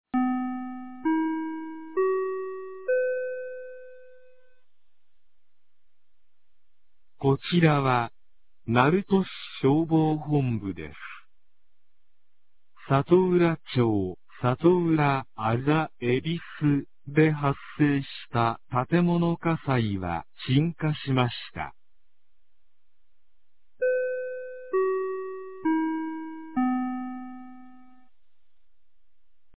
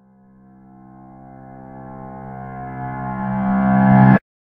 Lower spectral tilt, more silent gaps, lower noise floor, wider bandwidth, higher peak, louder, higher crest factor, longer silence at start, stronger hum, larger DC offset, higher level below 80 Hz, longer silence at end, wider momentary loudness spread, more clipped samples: about the same, -11.5 dB/octave vs -12 dB/octave; neither; first, -79 dBFS vs -49 dBFS; first, 4 kHz vs 3.4 kHz; second, -4 dBFS vs 0 dBFS; second, -26 LUFS vs -16 LUFS; about the same, 22 dB vs 20 dB; second, 0.05 s vs 1.5 s; neither; first, 0.5% vs under 0.1%; second, -58 dBFS vs -44 dBFS; first, 1.9 s vs 0.25 s; second, 14 LU vs 26 LU; neither